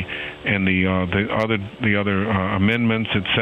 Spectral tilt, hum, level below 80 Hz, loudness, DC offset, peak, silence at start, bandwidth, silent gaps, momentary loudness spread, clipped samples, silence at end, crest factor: -8 dB/octave; none; -48 dBFS; -20 LUFS; under 0.1%; -6 dBFS; 0 s; 6 kHz; none; 4 LU; under 0.1%; 0 s; 16 dB